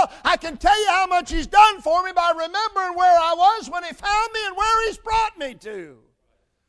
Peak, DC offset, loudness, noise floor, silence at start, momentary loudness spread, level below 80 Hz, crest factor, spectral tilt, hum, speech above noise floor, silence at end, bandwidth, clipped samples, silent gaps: 0 dBFS; under 0.1%; -19 LUFS; -69 dBFS; 0 s; 12 LU; -40 dBFS; 20 dB; -2 dB/octave; none; 49 dB; 0.8 s; 11 kHz; under 0.1%; none